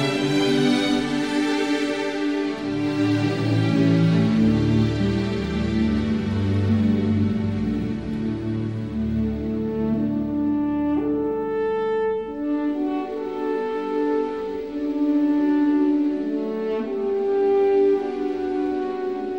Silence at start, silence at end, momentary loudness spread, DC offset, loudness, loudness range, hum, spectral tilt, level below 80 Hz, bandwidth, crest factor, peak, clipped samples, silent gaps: 0 s; 0 s; 7 LU; 0.2%; -22 LUFS; 4 LU; none; -7 dB/octave; -42 dBFS; 11 kHz; 14 dB; -8 dBFS; under 0.1%; none